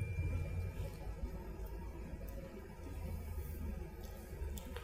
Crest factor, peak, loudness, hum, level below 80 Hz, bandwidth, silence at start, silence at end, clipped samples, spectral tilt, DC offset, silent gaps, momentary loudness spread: 16 dB; -26 dBFS; -46 LUFS; none; -48 dBFS; 16 kHz; 0 s; 0 s; under 0.1%; -6.5 dB/octave; under 0.1%; none; 9 LU